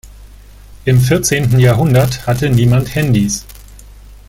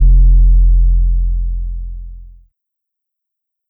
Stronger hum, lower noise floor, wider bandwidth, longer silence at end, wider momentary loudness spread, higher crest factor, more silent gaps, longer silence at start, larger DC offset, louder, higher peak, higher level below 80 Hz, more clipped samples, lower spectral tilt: first, 50 Hz at -35 dBFS vs none; second, -37 dBFS vs -79 dBFS; first, 16.5 kHz vs 0.5 kHz; second, 0.15 s vs 1.45 s; second, 6 LU vs 19 LU; about the same, 12 dB vs 8 dB; neither; about the same, 0.05 s vs 0 s; neither; about the same, -13 LUFS vs -15 LUFS; about the same, 0 dBFS vs -2 dBFS; second, -34 dBFS vs -12 dBFS; neither; second, -5.5 dB/octave vs -14 dB/octave